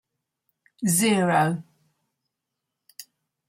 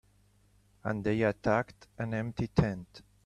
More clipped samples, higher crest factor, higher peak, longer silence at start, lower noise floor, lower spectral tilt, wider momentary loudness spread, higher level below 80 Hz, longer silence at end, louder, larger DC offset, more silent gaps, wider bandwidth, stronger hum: neither; about the same, 20 dB vs 24 dB; about the same, -8 dBFS vs -10 dBFS; about the same, 0.8 s vs 0.85 s; first, -83 dBFS vs -66 dBFS; second, -4.5 dB/octave vs -8 dB/octave; first, 24 LU vs 13 LU; second, -70 dBFS vs -52 dBFS; first, 0.45 s vs 0.25 s; first, -22 LUFS vs -32 LUFS; neither; neither; first, 16.5 kHz vs 10.5 kHz; second, none vs 50 Hz at -60 dBFS